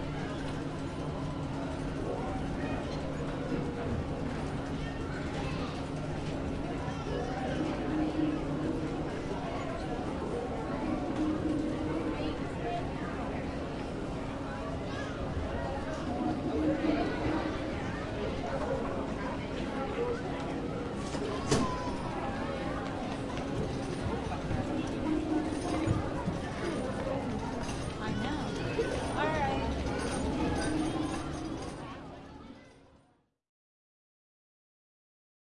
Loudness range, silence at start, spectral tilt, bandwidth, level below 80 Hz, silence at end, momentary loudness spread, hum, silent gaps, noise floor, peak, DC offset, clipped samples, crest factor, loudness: 3 LU; 0 s; -6 dB/octave; 11.5 kHz; -46 dBFS; 2.7 s; 5 LU; none; none; -69 dBFS; -16 dBFS; under 0.1%; under 0.1%; 20 dB; -35 LUFS